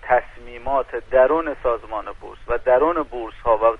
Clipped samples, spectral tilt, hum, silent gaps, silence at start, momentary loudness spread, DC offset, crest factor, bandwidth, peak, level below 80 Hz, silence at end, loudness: under 0.1%; -7 dB/octave; none; none; 0.05 s; 15 LU; under 0.1%; 16 dB; 4.7 kHz; -4 dBFS; -40 dBFS; 0 s; -21 LUFS